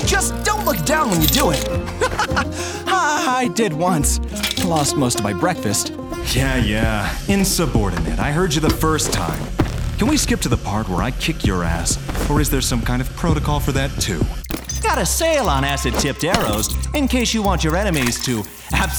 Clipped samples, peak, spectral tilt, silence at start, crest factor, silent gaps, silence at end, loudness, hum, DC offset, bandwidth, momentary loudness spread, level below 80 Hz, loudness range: under 0.1%; 0 dBFS; -4 dB/octave; 0 s; 18 dB; none; 0 s; -19 LUFS; none; under 0.1%; over 20 kHz; 5 LU; -26 dBFS; 2 LU